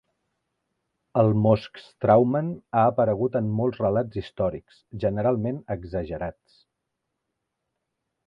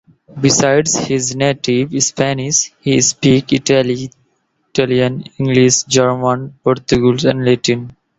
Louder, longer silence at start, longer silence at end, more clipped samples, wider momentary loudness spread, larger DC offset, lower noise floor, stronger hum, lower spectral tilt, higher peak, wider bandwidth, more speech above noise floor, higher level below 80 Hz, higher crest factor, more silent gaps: second, -24 LUFS vs -14 LUFS; first, 1.15 s vs 0.35 s; first, 1.95 s vs 0.25 s; neither; first, 13 LU vs 7 LU; neither; first, -81 dBFS vs -63 dBFS; neither; first, -10 dB/octave vs -4 dB/octave; second, -4 dBFS vs 0 dBFS; second, 5.8 kHz vs 8 kHz; first, 57 dB vs 49 dB; second, -52 dBFS vs -46 dBFS; first, 20 dB vs 14 dB; neither